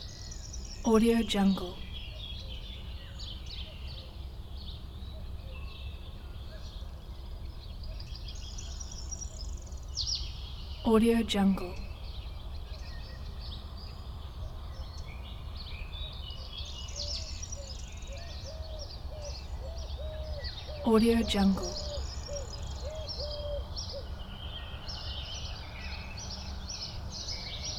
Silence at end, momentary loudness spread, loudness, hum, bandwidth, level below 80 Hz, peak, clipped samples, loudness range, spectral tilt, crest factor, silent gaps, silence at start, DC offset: 0 s; 17 LU; -35 LUFS; none; 17 kHz; -42 dBFS; -12 dBFS; under 0.1%; 12 LU; -5 dB/octave; 22 dB; none; 0 s; under 0.1%